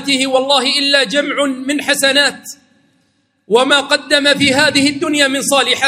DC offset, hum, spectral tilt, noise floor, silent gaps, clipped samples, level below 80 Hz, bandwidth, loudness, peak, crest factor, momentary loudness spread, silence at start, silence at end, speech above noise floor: under 0.1%; none; -2 dB/octave; -61 dBFS; none; under 0.1%; -58 dBFS; 16 kHz; -12 LUFS; 0 dBFS; 14 dB; 6 LU; 0 s; 0 s; 47 dB